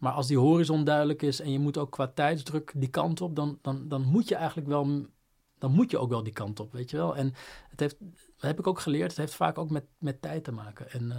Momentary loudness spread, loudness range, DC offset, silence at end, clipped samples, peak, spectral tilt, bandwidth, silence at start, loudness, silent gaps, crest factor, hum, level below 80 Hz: 12 LU; 5 LU; under 0.1%; 0 s; under 0.1%; -10 dBFS; -7 dB/octave; 16 kHz; 0 s; -29 LUFS; none; 20 dB; none; -64 dBFS